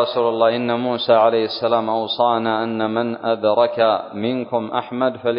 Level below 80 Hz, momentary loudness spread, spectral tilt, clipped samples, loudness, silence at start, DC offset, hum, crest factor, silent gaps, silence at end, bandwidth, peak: -64 dBFS; 7 LU; -10 dB/octave; under 0.1%; -19 LUFS; 0 s; under 0.1%; none; 18 dB; none; 0 s; 5.4 kHz; -2 dBFS